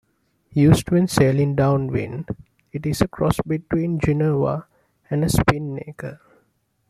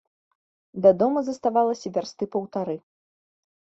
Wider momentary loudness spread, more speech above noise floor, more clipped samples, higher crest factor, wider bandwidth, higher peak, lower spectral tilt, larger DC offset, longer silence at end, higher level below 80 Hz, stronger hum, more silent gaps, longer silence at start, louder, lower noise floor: about the same, 15 LU vs 13 LU; second, 47 dB vs over 67 dB; neither; about the same, 18 dB vs 20 dB; first, 15 kHz vs 7.8 kHz; about the same, -2 dBFS vs -4 dBFS; about the same, -7 dB/octave vs -7 dB/octave; neither; about the same, 0.75 s vs 0.85 s; first, -42 dBFS vs -68 dBFS; neither; neither; second, 0.5 s vs 0.75 s; first, -21 LUFS vs -24 LUFS; second, -66 dBFS vs under -90 dBFS